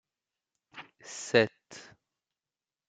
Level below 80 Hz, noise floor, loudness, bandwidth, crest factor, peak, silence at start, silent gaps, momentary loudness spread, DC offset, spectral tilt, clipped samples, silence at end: -76 dBFS; under -90 dBFS; -28 LUFS; 9.4 kHz; 26 dB; -8 dBFS; 0.75 s; none; 23 LU; under 0.1%; -4 dB/octave; under 0.1%; 1.1 s